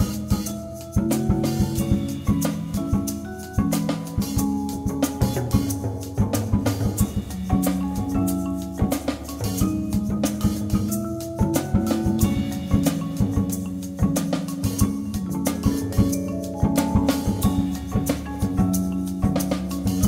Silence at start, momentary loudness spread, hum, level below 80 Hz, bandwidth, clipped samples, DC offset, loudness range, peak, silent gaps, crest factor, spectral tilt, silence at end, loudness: 0 s; 5 LU; none; -34 dBFS; 16.5 kHz; under 0.1%; under 0.1%; 2 LU; -6 dBFS; none; 16 dB; -6 dB/octave; 0 s; -24 LUFS